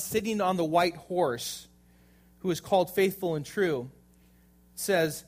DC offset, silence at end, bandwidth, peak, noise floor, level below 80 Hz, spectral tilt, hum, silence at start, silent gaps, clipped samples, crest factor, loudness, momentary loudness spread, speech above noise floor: under 0.1%; 0.05 s; 15.5 kHz; -12 dBFS; -60 dBFS; -62 dBFS; -4.5 dB/octave; 60 Hz at -55 dBFS; 0 s; none; under 0.1%; 18 dB; -29 LUFS; 11 LU; 32 dB